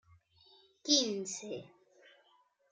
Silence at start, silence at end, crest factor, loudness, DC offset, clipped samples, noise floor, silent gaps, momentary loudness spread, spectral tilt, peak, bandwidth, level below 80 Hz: 0.85 s; 1.05 s; 28 dB; -33 LUFS; under 0.1%; under 0.1%; -71 dBFS; none; 17 LU; -2 dB/octave; -12 dBFS; 11 kHz; -84 dBFS